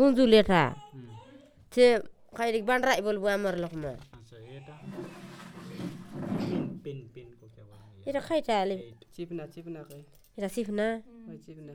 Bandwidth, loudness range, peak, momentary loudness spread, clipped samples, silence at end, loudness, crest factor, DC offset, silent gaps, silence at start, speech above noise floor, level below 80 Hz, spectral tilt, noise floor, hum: 17.5 kHz; 11 LU; -8 dBFS; 25 LU; under 0.1%; 0 s; -28 LUFS; 22 dB; under 0.1%; none; 0 s; 27 dB; -56 dBFS; -5.5 dB/octave; -54 dBFS; none